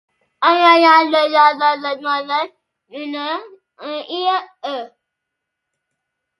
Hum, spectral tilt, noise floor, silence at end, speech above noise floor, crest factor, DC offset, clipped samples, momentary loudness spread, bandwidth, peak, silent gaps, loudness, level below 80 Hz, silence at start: none; -2.5 dB/octave; -79 dBFS; 1.55 s; 63 dB; 18 dB; under 0.1%; under 0.1%; 18 LU; 11.5 kHz; 0 dBFS; none; -15 LUFS; -78 dBFS; 0.4 s